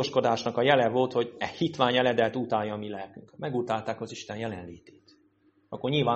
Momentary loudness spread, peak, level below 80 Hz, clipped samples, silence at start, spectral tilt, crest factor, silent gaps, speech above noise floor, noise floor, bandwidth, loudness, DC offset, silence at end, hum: 15 LU; -6 dBFS; -66 dBFS; under 0.1%; 0 s; -5.5 dB/octave; 22 dB; none; 38 dB; -66 dBFS; 8.4 kHz; -28 LUFS; under 0.1%; 0 s; none